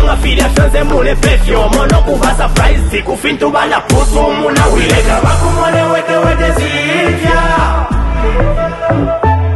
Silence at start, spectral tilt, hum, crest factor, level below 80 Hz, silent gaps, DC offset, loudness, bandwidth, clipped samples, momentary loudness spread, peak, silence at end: 0 s; -5 dB/octave; none; 10 dB; -14 dBFS; none; under 0.1%; -11 LUFS; 12.5 kHz; under 0.1%; 4 LU; 0 dBFS; 0 s